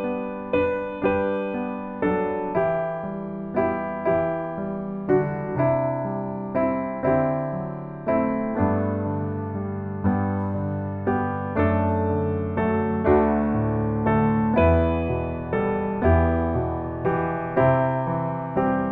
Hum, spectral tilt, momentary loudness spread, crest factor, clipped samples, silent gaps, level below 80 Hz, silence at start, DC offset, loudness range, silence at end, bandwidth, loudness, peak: none; -11.5 dB/octave; 9 LU; 18 dB; under 0.1%; none; -40 dBFS; 0 s; under 0.1%; 4 LU; 0 s; 4.2 kHz; -24 LUFS; -6 dBFS